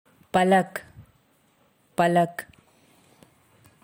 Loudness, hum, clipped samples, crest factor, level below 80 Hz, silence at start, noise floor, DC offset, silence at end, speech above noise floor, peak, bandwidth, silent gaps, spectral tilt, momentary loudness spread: -23 LUFS; none; under 0.1%; 18 dB; -66 dBFS; 0.35 s; -64 dBFS; under 0.1%; 1.45 s; 42 dB; -8 dBFS; 16.5 kHz; none; -6 dB/octave; 19 LU